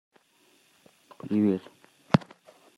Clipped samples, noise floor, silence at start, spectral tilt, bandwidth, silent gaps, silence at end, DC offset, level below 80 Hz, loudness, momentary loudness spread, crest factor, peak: under 0.1%; -64 dBFS; 1.25 s; -8 dB/octave; 11.5 kHz; none; 0.6 s; under 0.1%; -68 dBFS; -27 LUFS; 8 LU; 28 dB; -2 dBFS